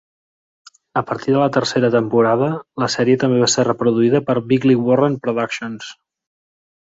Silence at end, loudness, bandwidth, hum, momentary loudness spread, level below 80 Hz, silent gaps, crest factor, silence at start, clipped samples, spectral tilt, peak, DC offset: 1 s; -17 LUFS; 8 kHz; none; 9 LU; -60 dBFS; none; 16 dB; 0.95 s; under 0.1%; -5.5 dB/octave; -2 dBFS; under 0.1%